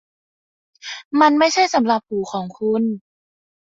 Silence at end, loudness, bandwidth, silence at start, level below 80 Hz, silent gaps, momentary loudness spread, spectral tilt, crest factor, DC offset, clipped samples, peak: 0.8 s; -18 LUFS; 7.8 kHz; 0.85 s; -64 dBFS; 1.05-1.11 s; 18 LU; -4 dB/octave; 18 dB; under 0.1%; under 0.1%; -2 dBFS